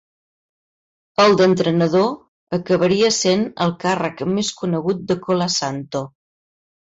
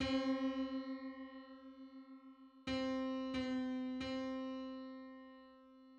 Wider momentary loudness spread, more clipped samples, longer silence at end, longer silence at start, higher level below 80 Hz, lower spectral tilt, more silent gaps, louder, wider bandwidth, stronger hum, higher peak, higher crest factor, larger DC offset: second, 11 LU vs 19 LU; neither; first, 0.75 s vs 0 s; first, 1.2 s vs 0 s; first, -58 dBFS vs -66 dBFS; about the same, -4.5 dB/octave vs -5.5 dB/octave; first, 2.28-2.47 s vs none; first, -19 LUFS vs -42 LUFS; about the same, 8 kHz vs 8 kHz; neither; first, -4 dBFS vs -26 dBFS; about the same, 14 dB vs 16 dB; neither